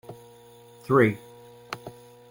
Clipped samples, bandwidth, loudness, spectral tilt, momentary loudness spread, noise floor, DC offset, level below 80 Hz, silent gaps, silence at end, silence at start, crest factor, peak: under 0.1%; 16.5 kHz; -22 LUFS; -7.5 dB/octave; 25 LU; -51 dBFS; under 0.1%; -64 dBFS; none; 0.4 s; 0.1 s; 22 dB; -6 dBFS